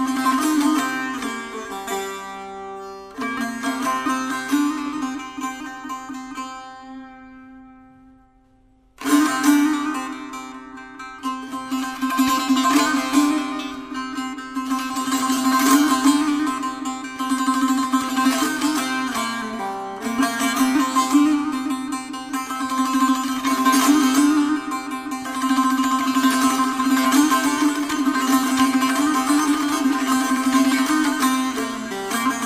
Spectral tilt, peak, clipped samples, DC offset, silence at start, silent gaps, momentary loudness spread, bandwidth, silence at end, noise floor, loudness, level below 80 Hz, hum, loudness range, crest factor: -2 dB/octave; -4 dBFS; under 0.1%; under 0.1%; 0 s; none; 14 LU; 15.5 kHz; 0 s; -56 dBFS; -20 LUFS; -58 dBFS; none; 8 LU; 18 dB